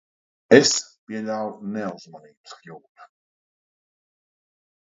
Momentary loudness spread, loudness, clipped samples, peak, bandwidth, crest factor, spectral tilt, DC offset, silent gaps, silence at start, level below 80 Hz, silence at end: 27 LU; -20 LUFS; under 0.1%; 0 dBFS; 8 kHz; 26 dB; -3 dB/octave; under 0.1%; 0.98-1.07 s, 2.37-2.44 s, 2.89-2.95 s; 0.5 s; -70 dBFS; 1.9 s